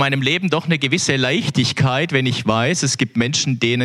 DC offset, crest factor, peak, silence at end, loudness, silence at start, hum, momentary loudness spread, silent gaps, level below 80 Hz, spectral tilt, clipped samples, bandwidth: under 0.1%; 16 dB; -2 dBFS; 0 s; -17 LUFS; 0 s; none; 2 LU; none; -54 dBFS; -4 dB/octave; under 0.1%; 12.5 kHz